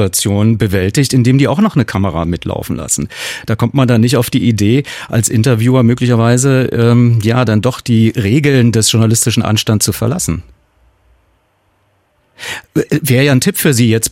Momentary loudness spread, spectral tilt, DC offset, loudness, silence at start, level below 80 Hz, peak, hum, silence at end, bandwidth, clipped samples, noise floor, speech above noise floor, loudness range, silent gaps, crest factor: 8 LU; -5 dB/octave; under 0.1%; -12 LUFS; 0 s; -40 dBFS; 0 dBFS; none; 0 s; 16.5 kHz; under 0.1%; -57 dBFS; 46 dB; 7 LU; none; 12 dB